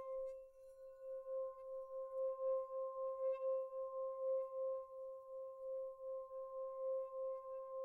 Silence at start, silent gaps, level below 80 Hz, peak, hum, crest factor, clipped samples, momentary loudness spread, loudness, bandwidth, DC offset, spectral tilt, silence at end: 0 s; none; -82 dBFS; -34 dBFS; none; 12 dB; under 0.1%; 10 LU; -46 LUFS; 2.8 kHz; under 0.1%; -4.5 dB/octave; 0 s